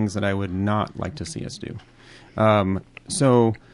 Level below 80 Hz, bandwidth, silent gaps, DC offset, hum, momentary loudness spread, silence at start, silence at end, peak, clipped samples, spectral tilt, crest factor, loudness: -44 dBFS; 11.5 kHz; none; under 0.1%; none; 17 LU; 0 s; 0.2 s; -4 dBFS; under 0.1%; -6 dB/octave; 18 dB; -23 LUFS